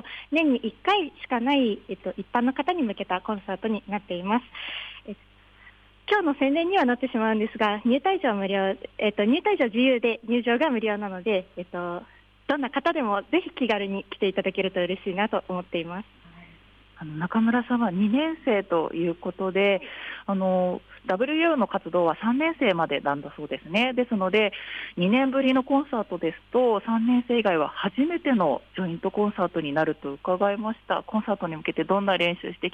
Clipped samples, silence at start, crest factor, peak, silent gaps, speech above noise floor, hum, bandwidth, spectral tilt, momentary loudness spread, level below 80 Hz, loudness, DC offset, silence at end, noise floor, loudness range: under 0.1%; 0.05 s; 14 dB; -10 dBFS; none; 29 dB; none; 6.4 kHz; -7.5 dB/octave; 10 LU; -60 dBFS; -25 LUFS; under 0.1%; 0.05 s; -53 dBFS; 4 LU